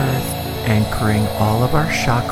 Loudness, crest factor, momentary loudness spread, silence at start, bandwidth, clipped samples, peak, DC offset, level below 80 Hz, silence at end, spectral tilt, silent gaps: -18 LUFS; 14 dB; 5 LU; 0 s; 16.5 kHz; under 0.1%; -2 dBFS; under 0.1%; -32 dBFS; 0 s; -5.5 dB/octave; none